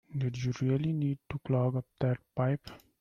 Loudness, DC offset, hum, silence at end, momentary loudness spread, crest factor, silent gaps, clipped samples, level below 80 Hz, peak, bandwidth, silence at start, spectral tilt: -32 LUFS; under 0.1%; none; 0.25 s; 6 LU; 14 dB; none; under 0.1%; -62 dBFS; -18 dBFS; 6.8 kHz; 0.1 s; -8.5 dB/octave